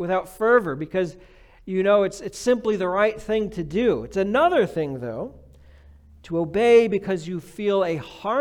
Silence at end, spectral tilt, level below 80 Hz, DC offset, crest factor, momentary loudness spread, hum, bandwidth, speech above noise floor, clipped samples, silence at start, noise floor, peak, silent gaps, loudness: 0 s; -6 dB/octave; -50 dBFS; under 0.1%; 18 dB; 11 LU; none; 14.5 kHz; 27 dB; under 0.1%; 0 s; -49 dBFS; -6 dBFS; none; -22 LUFS